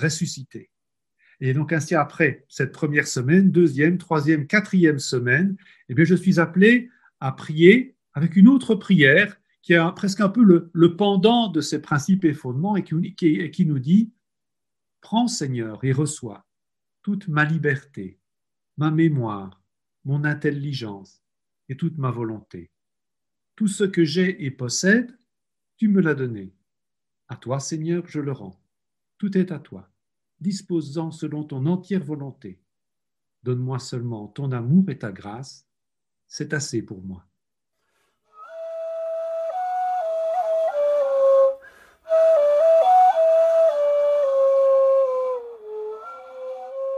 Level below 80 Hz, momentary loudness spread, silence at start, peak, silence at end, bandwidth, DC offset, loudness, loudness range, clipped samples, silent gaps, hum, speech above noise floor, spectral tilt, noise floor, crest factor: -64 dBFS; 18 LU; 0 s; 0 dBFS; 0 s; 12 kHz; under 0.1%; -21 LUFS; 12 LU; under 0.1%; none; none; 68 dB; -6 dB/octave; -89 dBFS; 22 dB